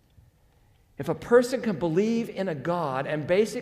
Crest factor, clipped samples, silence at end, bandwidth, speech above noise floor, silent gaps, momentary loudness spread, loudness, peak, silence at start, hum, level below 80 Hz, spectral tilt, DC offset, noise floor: 18 dB; under 0.1%; 0 s; 15.5 kHz; 36 dB; none; 10 LU; -26 LUFS; -8 dBFS; 1 s; none; -60 dBFS; -6 dB/octave; under 0.1%; -61 dBFS